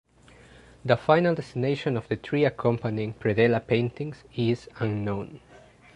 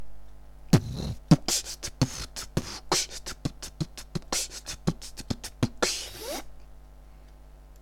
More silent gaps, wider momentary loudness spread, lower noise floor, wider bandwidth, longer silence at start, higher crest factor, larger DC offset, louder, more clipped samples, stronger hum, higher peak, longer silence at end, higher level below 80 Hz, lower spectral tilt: neither; about the same, 11 LU vs 12 LU; first, -53 dBFS vs -49 dBFS; second, 10 kHz vs 17.5 kHz; first, 0.85 s vs 0 s; about the same, 22 dB vs 26 dB; neither; first, -26 LUFS vs -30 LUFS; neither; neither; about the same, -4 dBFS vs -6 dBFS; first, 0.6 s vs 0 s; second, -56 dBFS vs -44 dBFS; first, -8 dB/octave vs -4 dB/octave